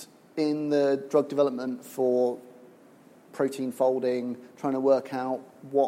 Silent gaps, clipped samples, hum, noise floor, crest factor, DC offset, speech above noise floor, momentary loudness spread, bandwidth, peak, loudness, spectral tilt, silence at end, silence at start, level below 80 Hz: none; under 0.1%; none; -54 dBFS; 16 dB; under 0.1%; 28 dB; 10 LU; 16.5 kHz; -10 dBFS; -27 LUFS; -6.5 dB/octave; 0 s; 0 s; -82 dBFS